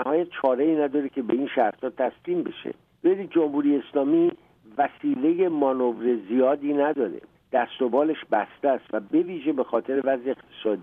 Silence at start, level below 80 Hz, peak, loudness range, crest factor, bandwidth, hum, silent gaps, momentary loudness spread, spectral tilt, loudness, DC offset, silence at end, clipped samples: 0 s; -72 dBFS; -8 dBFS; 2 LU; 16 dB; 3.8 kHz; none; none; 6 LU; -9 dB/octave; -25 LUFS; under 0.1%; 0 s; under 0.1%